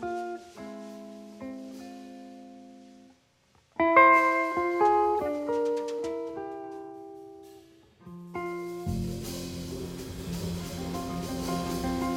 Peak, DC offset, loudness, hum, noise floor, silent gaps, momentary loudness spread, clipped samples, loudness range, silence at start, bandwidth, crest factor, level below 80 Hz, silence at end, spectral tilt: -6 dBFS; under 0.1%; -28 LUFS; 60 Hz at -75 dBFS; -65 dBFS; none; 23 LU; under 0.1%; 14 LU; 0 s; 17 kHz; 24 dB; -52 dBFS; 0 s; -5.5 dB/octave